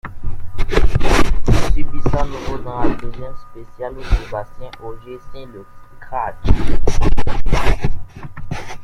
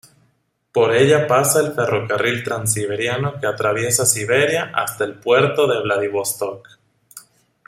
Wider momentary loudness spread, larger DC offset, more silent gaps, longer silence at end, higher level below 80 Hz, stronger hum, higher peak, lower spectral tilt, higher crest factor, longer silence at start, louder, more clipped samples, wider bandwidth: first, 17 LU vs 8 LU; neither; neither; second, 0 s vs 0.5 s; first, -20 dBFS vs -60 dBFS; neither; about the same, 0 dBFS vs 0 dBFS; first, -6 dB/octave vs -3.5 dB/octave; second, 12 dB vs 18 dB; second, 0.05 s vs 0.75 s; second, -22 LUFS vs -18 LUFS; neither; second, 9.4 kHz vs 16 kHz